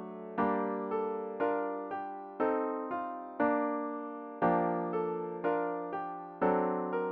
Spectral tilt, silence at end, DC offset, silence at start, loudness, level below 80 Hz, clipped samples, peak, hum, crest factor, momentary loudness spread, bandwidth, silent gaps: -6.5 dB/octave; 0 s; under 0.1%; 0 s; -34 LUFS; -72 dBFS; under 0.1%; -14 dBFS; none; 18 dB; 9 LU; 4.6 kHz; none